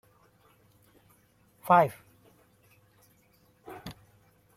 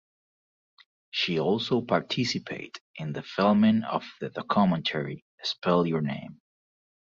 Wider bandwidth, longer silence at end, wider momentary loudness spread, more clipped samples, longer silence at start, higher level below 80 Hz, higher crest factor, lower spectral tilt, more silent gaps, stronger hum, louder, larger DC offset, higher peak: first, 16 kHz vs 7.6 kHz; second, 0.65 s vs 0.85 s; first, 26 LU vs 14 LU; neither; first, 1.65 s vs 1.15 s; about the same, -68 dBFS vs -64 dBFS; first, 26 dB vs 18 dB; about the same, -6.5 dB/octave vs -6 dB/octave; second, none vs 2.81-2.94 s, 5.22-5.38 s; neither; first, -24 LUFS vs -27 LUFS; neither; about the same, -8 dBFS vs -10 dBFS